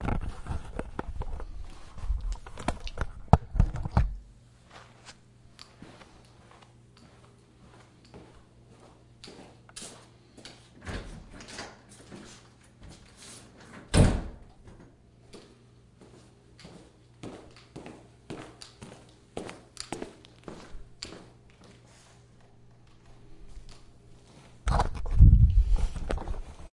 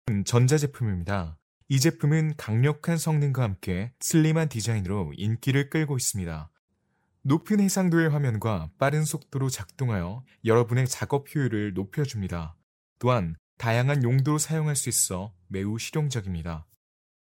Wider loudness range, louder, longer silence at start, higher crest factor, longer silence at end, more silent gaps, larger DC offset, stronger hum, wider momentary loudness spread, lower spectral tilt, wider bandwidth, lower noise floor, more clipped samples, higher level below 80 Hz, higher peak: first, 25 LU vs 2 LU; second, -30 LUFS vs -26 LUFS; about the same, 0 s vs 0.05 s; first, 30 dB vs 20 dB; second, 0.1 s vs 0.55 s; second, none vs 1.42-1.61 s, 6.59-6.68 s, 12.63-12.96 s, 13.39-13.57 s; neither; neither; first, 27 LU vs 10 LU; about the same, -6.5 dB/octave vs -5.5 dB/octave; second, 11.5 kHz vs 17 kHz; second, -57 dBFS vs -72 dBFS; neither; first, -34 dBFS vs -52 dBFS; first, 0 dBFS vs -6 dBFS